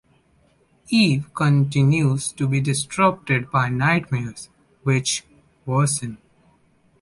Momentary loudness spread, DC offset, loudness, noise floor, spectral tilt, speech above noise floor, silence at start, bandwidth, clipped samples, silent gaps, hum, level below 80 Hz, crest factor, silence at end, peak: 9 LU; under 0.1%; -21 LUFS; -60 dBFS; -5 dB/octave; 40 dB; 0.9 s; 11.5 kHz; under 0.1%; none; none; -54 dBFS; 16 dB; 0.85 s; -4 dBFS